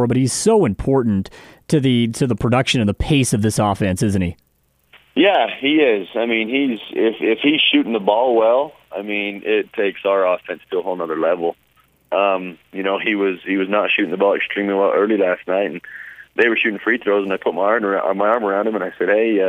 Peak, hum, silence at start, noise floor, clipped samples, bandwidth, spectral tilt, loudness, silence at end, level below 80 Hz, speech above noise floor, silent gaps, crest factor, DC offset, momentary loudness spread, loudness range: -2 dBFS; none; 0 s; -55 dBFS; under 0.1%; 15 kHz; -5 dB/octave; -18 LUFS; 0 s; -42 dBFS; 38 dB; none; 16 dB; under 0.1%; 9 LU; 4 LU